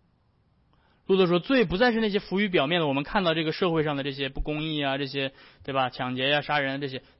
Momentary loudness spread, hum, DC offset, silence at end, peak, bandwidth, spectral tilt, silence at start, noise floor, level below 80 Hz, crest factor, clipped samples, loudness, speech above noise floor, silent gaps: 9 LU; none; under 0.1%; 0.2 s; -12 dBFS; 5.8 kHz; -9.5 dB/octave; 1.1 s; -66 dBFS; -46 dBFS; 14 dB; under 0.1%; -26 LUFS; 40 dB; none